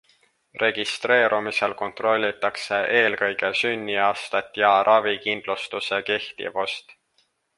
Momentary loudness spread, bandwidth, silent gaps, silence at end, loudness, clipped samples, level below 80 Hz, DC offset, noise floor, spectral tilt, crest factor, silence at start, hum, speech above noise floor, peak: 9 LU; 11.5 kHz; none; 0.65 s; -22 LUFS; under 0.1%; -68 dBFS; under 0.1%; -68 dBFS; -3 dB/octave; 20 dB; 0.55 s; none; 45 dB; -4 dBFS